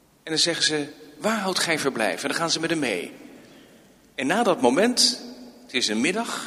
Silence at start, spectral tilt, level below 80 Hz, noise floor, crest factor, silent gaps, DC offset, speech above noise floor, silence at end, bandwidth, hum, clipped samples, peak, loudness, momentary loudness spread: 0.25 s; -2.5 dB/octave; -68 dBFS; -53 dBFS; 20 dB; none; under 0.1%; 30 dB; 0 s; 15.5 kHz; none; under 0.1%; -4 dBFS; -23 LUFS; 11 LU